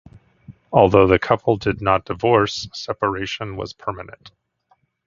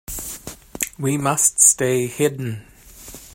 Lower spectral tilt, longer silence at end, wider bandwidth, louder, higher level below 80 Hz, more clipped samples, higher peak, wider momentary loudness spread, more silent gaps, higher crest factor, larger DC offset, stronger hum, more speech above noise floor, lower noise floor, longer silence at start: first, -6 dB/octave vs -3.5 dB/octave; first, 0.8 s vs 0 s; second, 7.6 kHz vs 16.5 kHz; about the same, -19 LUFS vs -17 LUFS; first, -42 dBFS vs -48 dBFS; neither; about the same, 0 dBFS vs 0 dBFS; second, 15 LU vs 23 LU; neither; about the same, 20 dB vs 22 dB; neither; neither; first, 44 dB vs 22 dB; first, -63 dBFS vs -41 dBFS; first, 0.5 s vs 0.1 s